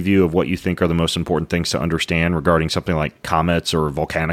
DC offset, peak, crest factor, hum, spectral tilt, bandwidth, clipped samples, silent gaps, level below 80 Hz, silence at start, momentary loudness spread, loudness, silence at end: under 0.1%; -2 dBFS; 18 dB; none; -5.5 dB/octave; 15.5 kHz; under 0.1%; none; -36 dBFS; 0 s; 5 LU; -19 LUFS; 0 s